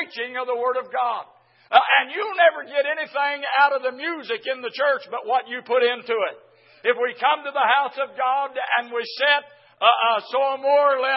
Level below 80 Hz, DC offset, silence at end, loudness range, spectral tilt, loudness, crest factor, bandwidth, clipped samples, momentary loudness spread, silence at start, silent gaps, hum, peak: under -90 dBFS; under 0.1%; 0 s; 3 LU; -4.5 dB/octave; -21 LUFS; 22 dB; 5.8 kHz; under 0.1%; 9 LU; 0 s; none; none; 0 dBFS